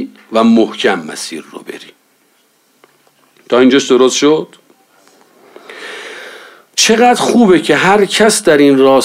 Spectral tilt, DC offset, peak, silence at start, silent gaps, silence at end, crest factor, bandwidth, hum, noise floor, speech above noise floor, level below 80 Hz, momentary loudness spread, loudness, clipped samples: -3.5 dB/octave; under 0.1%; 0 dBFS; 0 s; none; 0 s; 12 dB; 16 kHz; none; -54 dBFS; 45 dB; -54 dBFS; 21 LU; -10 LUFS; under 0.1%